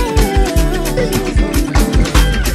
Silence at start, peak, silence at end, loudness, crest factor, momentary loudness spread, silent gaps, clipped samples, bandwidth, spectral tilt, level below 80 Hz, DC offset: 0 s; 0 dBFS; 0 s; -15 LUFS; 12 dB; 3 LU; none; under 0.1%; 15 kHz; -5 dB/octave; -14 dBFS; under 0.1%